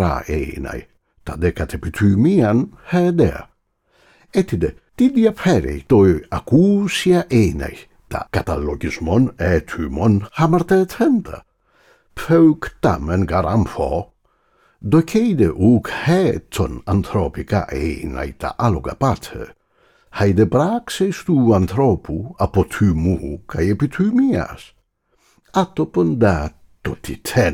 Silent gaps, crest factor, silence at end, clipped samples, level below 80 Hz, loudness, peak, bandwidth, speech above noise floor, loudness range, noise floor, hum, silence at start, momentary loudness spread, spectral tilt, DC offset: none; 14 dB; 0 s; under 0.1%; -36 dBFS; -18 LUFS; -4 dBFS; 17 kHz; 45 dB; 4 LU; -62 dBFS; none; 0 s; 13 LU; -7.5 dB/octave; under 0.1%